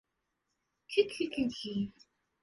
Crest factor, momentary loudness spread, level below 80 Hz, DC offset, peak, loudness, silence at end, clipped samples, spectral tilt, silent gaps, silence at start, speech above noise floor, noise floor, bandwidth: 22 dB; 7 LU; -68 dBFS; under 0.1%; -14 dBFS; -34 LUFS; 0.55 s; under 0.1%; -5.5 dB/octave; none; 0.9 s; 50 dB; -83 dBFS; 11.5 kHz